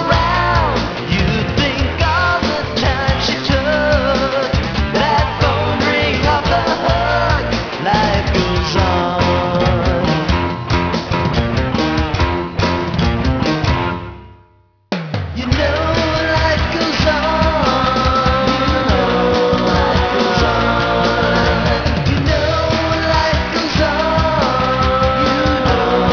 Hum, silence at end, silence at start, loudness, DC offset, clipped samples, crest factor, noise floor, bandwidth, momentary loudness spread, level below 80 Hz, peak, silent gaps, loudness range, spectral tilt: none; 0 s; 0 s; -15 LUFS; under 0.1%; under 0.1%; 14 dB; -52 dBFS; 5.4 kHz; 3 LU; -24 dBFS; 0 dBFS; none; 4 LU; -6 dB/octave